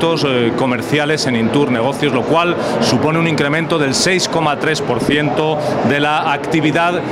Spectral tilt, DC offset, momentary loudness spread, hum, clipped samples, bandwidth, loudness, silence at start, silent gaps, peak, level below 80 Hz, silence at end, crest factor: -4.5 dB/octave; under 0.1%; 3 LU; none; under 0.1%; 16 kHz; -15 LUFS; 0 s; none; 0 dBFS; -48 dBFS; 0 s; 14 dB